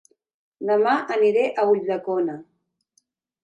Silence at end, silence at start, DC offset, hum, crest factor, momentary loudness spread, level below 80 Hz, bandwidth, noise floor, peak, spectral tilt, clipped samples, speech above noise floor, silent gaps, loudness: 1 s; 0.6 s; under 0.1%; none; 14 dB; 9 LU; -80 dBFS; 8.6 kHz; -69 dBFS; -8 dBFS; -6.5 dB/octave; under 0.1%; 48 dB; none; -22 LUFS